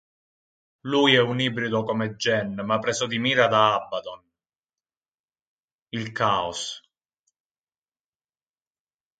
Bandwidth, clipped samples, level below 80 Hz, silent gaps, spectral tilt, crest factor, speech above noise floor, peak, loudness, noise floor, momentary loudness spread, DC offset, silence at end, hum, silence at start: 9.4 kHz; under 0.1%; -64 dBFS; 5.08-5.28 s, 5.42-5.86 s; -4 dB/octave; 24 dB; over 67 dB; -4 dBFS; -23 LUFS; under -90 dBFS; 15 LU; under 0.1%; 2.4 s; none; 0.85 s